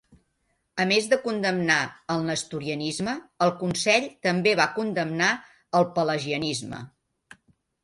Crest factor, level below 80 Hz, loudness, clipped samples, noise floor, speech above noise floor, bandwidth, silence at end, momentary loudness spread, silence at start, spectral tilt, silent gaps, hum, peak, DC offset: 20 dB; -64 dBFS; -25 LUFS; under 0.1%; -73 dBFS; 48 dB; 11.5 kHz; 0.95 s; 9 LU; 0.75 s; -4 dB/octave; none; none; -6 dBFS; under 0.1%